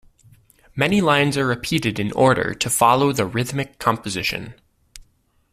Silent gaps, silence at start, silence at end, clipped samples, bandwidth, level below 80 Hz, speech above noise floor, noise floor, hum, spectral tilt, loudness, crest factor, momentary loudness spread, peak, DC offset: none; 0.75 s; 0.55 s; under 0.1%; 15.5 kHz; -50 dBFS; 40 dB; -60 dBFS; none; -4.5 dB/octave; -19 LUFS; 18 dB; 9 LU; -2 dBFS; under 0.1%